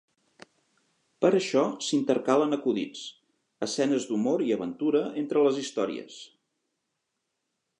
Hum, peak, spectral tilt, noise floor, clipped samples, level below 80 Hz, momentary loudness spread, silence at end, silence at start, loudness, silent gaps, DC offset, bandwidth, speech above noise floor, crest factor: none; -8 dBFS; -5 dB/octave; -81 dBFS; under 0.1%; -80 dBFS; 12 LU; 1.55 s; 1.2 s; -27 LUFS; none; under 0.1%; 11 kHz; 55 dB; 20 dB